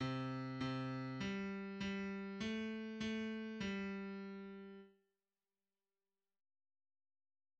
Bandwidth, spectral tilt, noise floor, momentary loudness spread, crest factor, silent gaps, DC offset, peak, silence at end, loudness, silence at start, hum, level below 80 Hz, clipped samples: 8.4 kHz; -6.5 dB/octave; under -90 dBFS; 9 LU; 16 dB; none; under 0.1%; -30 dBFS; 2.7 s; -45 LUFS; 0 s; none; -74 dBFS; under 0.1%